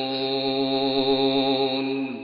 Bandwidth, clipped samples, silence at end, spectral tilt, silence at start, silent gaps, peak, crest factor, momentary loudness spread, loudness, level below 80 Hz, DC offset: 5.2 kHz; under 0.1%; 0 s; -2.5 dB/octave; 0 s; none; -10 dBFS; 12 dB; 4 LU; -23 LUFS; -60 dBFS; under 0.1%